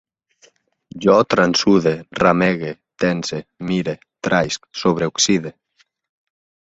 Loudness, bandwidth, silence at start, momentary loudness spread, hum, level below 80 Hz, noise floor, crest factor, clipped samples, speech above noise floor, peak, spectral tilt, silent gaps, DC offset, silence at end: -18 LUFS; 8 kHz; 0.95 s; 13 LU; none; -52 dBFS; -62 dBFS; 18 dB; under 0.1%; 45 dB; -2 dBFS; -4.5 dB/octave; none; under 0.1%; 1.2 s